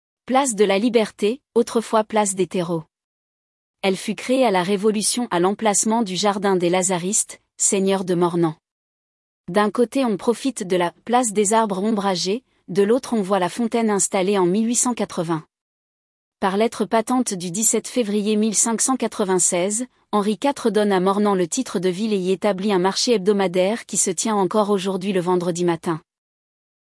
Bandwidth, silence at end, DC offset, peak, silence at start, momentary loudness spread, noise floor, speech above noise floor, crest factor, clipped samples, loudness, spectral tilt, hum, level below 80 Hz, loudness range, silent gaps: 12 kHz; 0.95 s; under 0.1%; -4 dBFS; 0.25 s; 6 LU; under -90 dBFS; over 70 dB; 16 dB; under 0.1%; -20 LUFS; -4 dB/octave; none; -68 dBFS; 3 LU; 3.04-3.74 s, 8.71-9.44 s, 15.61-16.32 s